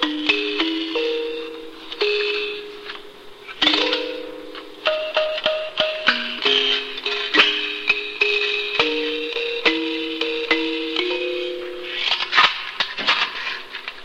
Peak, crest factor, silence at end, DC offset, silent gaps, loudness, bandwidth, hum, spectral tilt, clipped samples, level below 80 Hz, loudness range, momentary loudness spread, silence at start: -2 dBFS; 20 dB; 0 s; under 0.1%; none; -20 LUFS; 15.5 kHz; none; -2 dB/octave; under 0.1%; -58 dBFS; 4 LU; 15 LU; 0 s